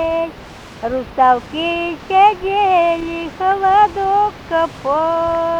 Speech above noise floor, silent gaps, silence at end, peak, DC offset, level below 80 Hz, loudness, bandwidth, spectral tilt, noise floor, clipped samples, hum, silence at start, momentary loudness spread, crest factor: 20 dB; none; 0 s; -2 dBFS; under 0.1%; -42 dBFS; -16 LUFS; 9.4 kHz; -5.5 dB/octave; -35 dBFS; under 0.1%; none; 0 s; 11 LU; 14 dB